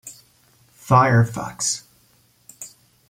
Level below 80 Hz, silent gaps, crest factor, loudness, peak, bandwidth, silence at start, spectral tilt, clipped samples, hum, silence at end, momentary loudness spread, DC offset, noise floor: -58 dBFS; none; 20 dB; -19 LUFS; -2 dBFS; 16 kHz; 0.05 s; -5 dB/octave; under 0.1%; none; 0.4 s; 24 LU; under 0.1%; -59 dBFS